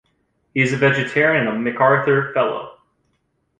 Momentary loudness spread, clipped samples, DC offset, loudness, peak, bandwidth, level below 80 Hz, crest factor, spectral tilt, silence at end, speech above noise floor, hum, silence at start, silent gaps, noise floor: 9 LU; under 0.1%; under 0.1%; -18 LUFS; -2 dBFS; 9.6 kHz; -58 dBFS; 18 dB; -6.5 dB/octave; 0.85 s; 51 dB; none; 0.55 s; none; -68 dBFS